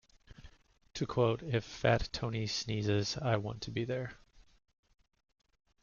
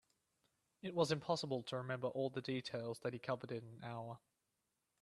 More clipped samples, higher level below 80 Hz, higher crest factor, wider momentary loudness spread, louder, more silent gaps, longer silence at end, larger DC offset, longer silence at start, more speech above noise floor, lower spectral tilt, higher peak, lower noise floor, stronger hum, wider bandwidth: neither; first, -56 dBFS vs -82 dBFS; about the same, 20 dB vs 24 dB; second, 8 LU vs 12 LU; first, -34 LUFS vs -43 LUFS; neither; first, 1.45 s vs 0.85 s; neither; second, 0.3 s vs 0.85 s; second, 22 dB vs 45 dB; about the same, -5.5 dB/octave vs -5.5 dB/octave; first, -16 dBFS vs -20 dBFS; second, -56 dBFS vs -87 dBFS; neither; second, 7.2 kHz vs 12.5 kHz